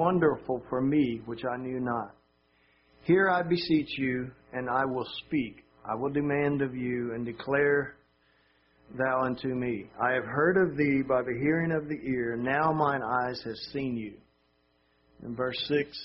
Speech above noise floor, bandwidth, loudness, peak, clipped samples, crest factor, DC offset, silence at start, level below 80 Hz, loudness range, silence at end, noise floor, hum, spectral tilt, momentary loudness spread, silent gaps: 41 dB; 5.8 kHz; -29 LUFS; -12 dBFS; under 0.1%; 18 dB; under 0.1%; 0 s; -62 dBFS; 4 LU; 0 s; -70 dBFS; none; -4.5 dB/octave; 11 LU; none